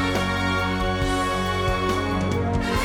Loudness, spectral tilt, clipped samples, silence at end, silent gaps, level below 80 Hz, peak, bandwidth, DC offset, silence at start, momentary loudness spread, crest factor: -23 LUFS; -5.5 dB/octave; under 0.1%; 0 s; none; -34 dBFS; -10 dBFS; 16.5 kHz; under 0.1%; 0 s; 1 LU; 12 dB